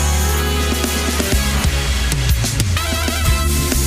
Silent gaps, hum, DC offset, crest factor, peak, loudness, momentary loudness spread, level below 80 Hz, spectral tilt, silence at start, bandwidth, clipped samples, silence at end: none; none; under 0.1%; 12 dB; -4 dBFS; -17 LUFS; 1 LU; -20 dBFS; -3.5 dB/octave; 0 s; 16 kHz; under 0.1%; 0 s